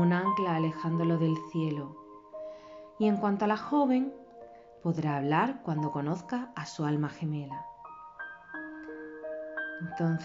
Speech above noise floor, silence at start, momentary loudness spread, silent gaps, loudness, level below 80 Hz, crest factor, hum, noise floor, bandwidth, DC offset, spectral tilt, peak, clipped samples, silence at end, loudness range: 21 dB; 0 s; 18 LU; none; -31 LUFS; -72 dBFS; 16 dB; none; -51 dBFS; 7.6 kHz; under 0.1%; -6.5 dB/octave; -14 dBFS; under 0.1%; 0 s; 7 LU